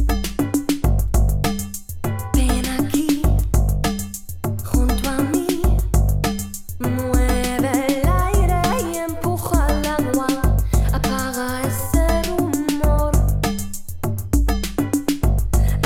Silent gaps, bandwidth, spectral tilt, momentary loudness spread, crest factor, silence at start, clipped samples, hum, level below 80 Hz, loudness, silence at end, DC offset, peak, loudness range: none; 16.5 kHz; -5.5 dB/octave; 8 LU; 14 dB; 0 s; under 0.1%; none; -22 dBFS; -21 LUFS; 0 s; under 0.1%; -4 dBFS; 1 LU